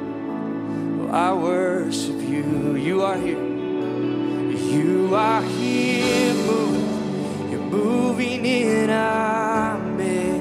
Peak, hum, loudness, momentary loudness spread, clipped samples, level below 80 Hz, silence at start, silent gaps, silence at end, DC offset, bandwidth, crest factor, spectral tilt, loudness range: -6 dBFS; none; -22 LUFS; 7 LU; under 0.1%; -56 dBFS; 0 s; none; 0 s; under 0.1%; 15 kHz; 14 dB; -5.5 dB/octave; 2 LU